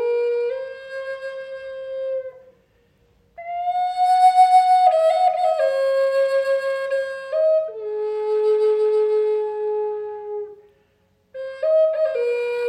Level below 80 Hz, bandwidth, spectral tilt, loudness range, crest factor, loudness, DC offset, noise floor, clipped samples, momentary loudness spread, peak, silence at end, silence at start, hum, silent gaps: -70 dBFS; 12 kHz; -2 dB/octave; 11 LU; 16 dB; -20 LUFS; under 0.1%; -63 dBFS; under 0.1%; 17 LU; -4 dBFS; 0 s; 0 s; none; none